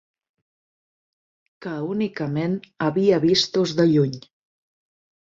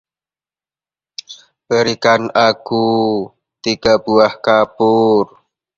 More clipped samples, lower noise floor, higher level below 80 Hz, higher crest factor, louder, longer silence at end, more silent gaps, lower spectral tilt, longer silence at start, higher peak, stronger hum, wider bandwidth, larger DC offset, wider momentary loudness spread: neither; about the same, under -90 dBFS vs under -90 dBFS; second, -62 dBFS vs -54 dBFS; about the same, 18 dB vs 16 dB; second, -21 LUFS vs -14 LUFS; first, 1 s vs 0.5 s; neither; about the same, -6 dB/octave vs -5 dB/octave; first, 1.6 s vs 1.3 s; second, -6 dBFS vs 0 dBFS; neither; about the same, 7.8 kHz vs 7.6 kHz; neither; second, 12 LU vs 17 LU